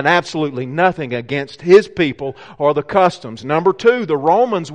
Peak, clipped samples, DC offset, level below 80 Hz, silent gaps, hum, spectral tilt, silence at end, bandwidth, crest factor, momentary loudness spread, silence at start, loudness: 0 dBFS; under 0.1%; 0.2%; -54 dBFS; none; none; -6 dB/octave; 0 s; 9.4 kHz; 16 dB; 11 LU; 0 s; -16 LUFS